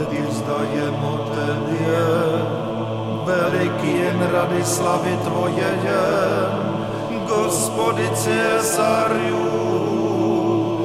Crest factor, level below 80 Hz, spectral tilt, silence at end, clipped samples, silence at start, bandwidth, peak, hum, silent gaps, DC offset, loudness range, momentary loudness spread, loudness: 14 dB; -54 dBFS; -5 dB/octave; 0 s; under 0.1%; 0 s; 16 kHz; -6 dBFS; none; none; under 0.1%; 2 LU; 5 LU; -20 LUFS